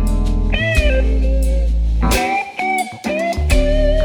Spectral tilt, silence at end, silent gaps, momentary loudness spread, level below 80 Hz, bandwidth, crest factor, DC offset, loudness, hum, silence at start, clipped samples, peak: -5.5 dB/octave; 0 s; none; 4 LU; -16 dBFS; 19 kHz; 12 dB; under 0.1%; -17 LUFS; none; 0 s; under 0.1%; -2 dBFS